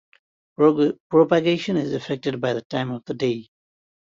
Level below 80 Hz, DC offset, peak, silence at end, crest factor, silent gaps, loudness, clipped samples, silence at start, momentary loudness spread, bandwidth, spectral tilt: -64 dBFS; under 0.1%; -4 dBFS; 0.75 s; 18 dB; 1.00-1.10 s, 2.65-2.70 s; -22 LUFS; under 0.1%; 0.6 s; 9 LU; 7.6 kHz; -7 dB/octave